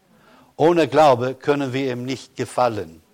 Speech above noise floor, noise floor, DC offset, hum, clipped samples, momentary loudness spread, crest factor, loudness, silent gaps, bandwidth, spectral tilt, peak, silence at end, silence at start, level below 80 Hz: 33 dB; -52 dBFS; under 0.1%; none; under 0.1%; 13 LU; 14 dB; -20 LUFS; none; 16 kHz; -6 dB/octave; -6 dBFS; 0.2 s; 0.6 s; -60 dBFS